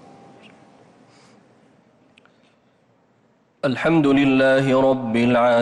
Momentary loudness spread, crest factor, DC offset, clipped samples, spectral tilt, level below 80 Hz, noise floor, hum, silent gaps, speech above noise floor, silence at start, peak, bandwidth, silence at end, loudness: 6 LU; 12 dB; under 0.1%; under 0.1%; -7 dB/octave; -56 dBFS; -60 dBFS; none; none; 44 dB; 3.65 s; -8 dBFS; 10 kHz; 0 s; -18 LUFS